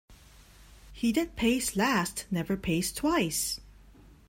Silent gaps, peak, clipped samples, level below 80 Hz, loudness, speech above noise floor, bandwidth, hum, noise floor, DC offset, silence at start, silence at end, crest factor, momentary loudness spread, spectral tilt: none; -12 dBFS; under 0.1%; -50 dBFS; -29 LUFS; 26 dB; 16.5 kHz; none; -54 dBFS; under 0.1%; 0.1 s; 0.15 s; 20 dB; 5 LU; -4 dB/octave